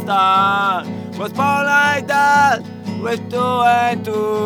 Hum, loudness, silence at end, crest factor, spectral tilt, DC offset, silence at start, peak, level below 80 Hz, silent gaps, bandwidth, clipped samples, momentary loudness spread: none; -16 LUFS; 0 s; 14 dB; -4.5 dB/octave; under 0.1%; 0 s; -2 dBFS; -70 dBFS; none; over 20 kHz; under 0.1%; 12 LU